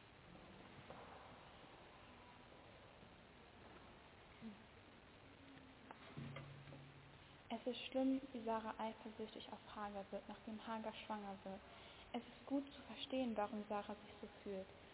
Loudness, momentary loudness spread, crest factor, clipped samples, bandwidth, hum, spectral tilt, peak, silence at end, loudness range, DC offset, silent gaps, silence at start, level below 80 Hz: -49 LUFS; 18 LU; 20 dB; under 0.1%; 4 kHz; none; -4 dB/octave; -30 dBFS; 0 s; 15 LU; under 0.1%; none; 0 s; -74 dBFS